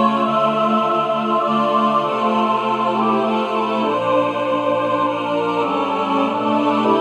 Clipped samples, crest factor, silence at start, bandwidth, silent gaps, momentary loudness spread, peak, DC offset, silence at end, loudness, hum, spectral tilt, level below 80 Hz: under 0.1%; 16 dB; 0 s; 10 kHz; none; 3 LU; -2 dBFS; under 0.1%; 0 s; -18 LUFS; none; -6.5 dB/octave; -72 dBFS